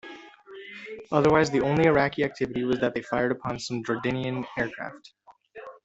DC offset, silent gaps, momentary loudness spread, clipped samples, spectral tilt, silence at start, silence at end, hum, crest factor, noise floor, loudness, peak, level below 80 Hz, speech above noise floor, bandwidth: under 0.1%; none; 23 LU; under 0.1%; -6 dB/octave; 0.05 s; 0.1 s; none; 20 dB; -46 dBFS; -25 LUFS; -6 dBFS; -56 dBFS; 21 dB; 8.2 kHz